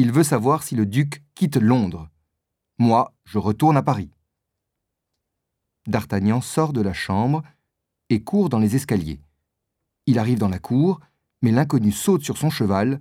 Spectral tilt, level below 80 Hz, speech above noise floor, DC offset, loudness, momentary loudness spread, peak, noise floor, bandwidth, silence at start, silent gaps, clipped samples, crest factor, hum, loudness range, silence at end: -6.5 dB/octave; -52 dBFS; 61 dB; under 0.1%; -21 LUFS; 9 LU; -4 dBFS; -80 dBFS; 16 kHz; 0 s; none; under 0.1%; 18 dB; none; 3 LU; 0 s